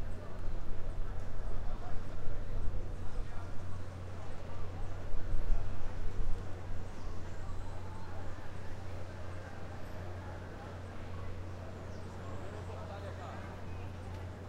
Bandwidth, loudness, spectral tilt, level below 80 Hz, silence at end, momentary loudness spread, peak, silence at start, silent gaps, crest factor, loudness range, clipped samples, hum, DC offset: 6.4 kHz; -45 LUFS; -7 dB/octave; -40 dBFS; 0 s; 4 LU; -16 dBFS; 0 s; none; 16 dB; 2 LU; under 0.1%; none; under 0.1%